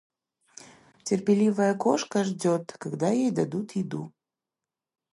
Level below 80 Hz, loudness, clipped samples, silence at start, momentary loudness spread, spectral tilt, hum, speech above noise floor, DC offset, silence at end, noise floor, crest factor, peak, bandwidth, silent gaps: -72 dBFS; -26 LUFS; under 0.1%; 0.6 s; 13 LU; -6 dB/octave; none; 64 dB; under 0.1%; 1.05 s; -89 dBFS; 20 dB; -8 dBFS; 11.5 kHz; none